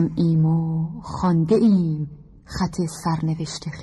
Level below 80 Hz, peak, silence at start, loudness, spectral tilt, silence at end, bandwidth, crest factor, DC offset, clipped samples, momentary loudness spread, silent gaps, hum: -46 dBFS; -8 dBFS; 0 s; -22 LUFS; -7.5 dB/octave; 0 s; 12 kHz; 14 dB; under 0.1%; under 0.1%; 12 LU; none; none